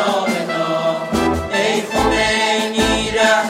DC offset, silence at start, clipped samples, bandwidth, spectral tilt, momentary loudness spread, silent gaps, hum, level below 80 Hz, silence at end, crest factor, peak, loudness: under 0.1%; 0 s; under 0.1%; 16 kHz; -3.5 dB/octave; 4 LU; none; none; -34 dBFS; 0 s; 16 dB; 0 dBFS; -17 LUFS